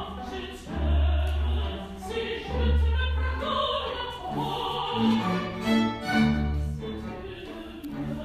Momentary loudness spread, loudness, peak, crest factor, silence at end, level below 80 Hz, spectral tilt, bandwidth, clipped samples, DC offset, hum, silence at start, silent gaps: 12 LU; -28 LUFS; -12 dBFS; 16 dB; 0 s; -30 dBFS; -6.5 dB/octave; 12.5 kHz; under 0.1%; under 0.1%; none; 0 s; none